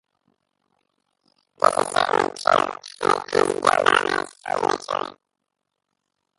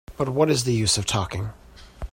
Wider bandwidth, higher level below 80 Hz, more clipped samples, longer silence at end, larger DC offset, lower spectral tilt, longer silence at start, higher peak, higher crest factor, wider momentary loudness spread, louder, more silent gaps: second, 11.5 kHz vs 16.5 kHz; second, -62 dBFS vs -42 dBFS; neither; first, 1.25 s vs 0.05 s; neither; about the same, -3 dB/octave vs -4 dB/octave; first, 1.65 s vs 0.1 s; first, 0 dBFS vs -6 dBFS; first, 24 dB vs 18 dB; second, 10 LU vs 13 LU; about the same, -21 LUFS vs -23 LUFS; neither